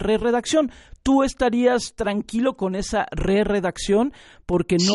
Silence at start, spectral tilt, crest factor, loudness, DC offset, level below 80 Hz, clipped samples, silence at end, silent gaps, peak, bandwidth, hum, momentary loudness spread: 0 s; -5 dB/octave; 16 dB; -22 LUFS; under 0.1%; -38 dBFS; under 0.1%; 0 s; none; -6 dBFS; 11.5 kHz; none; 7 LU